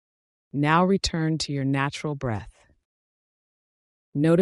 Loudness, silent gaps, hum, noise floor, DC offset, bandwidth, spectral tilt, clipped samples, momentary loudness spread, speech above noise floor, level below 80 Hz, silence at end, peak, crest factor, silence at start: -25 LUFS; 2.85-4.12 s; none; under -90 dBFS; under 0.1%; 11.5 kHz; -6 dB/octave; under 0.1%; 13 LU; over 67 dB; -48 dBFS; 0 s; -8 dBFS; 18 dB; 0.55 s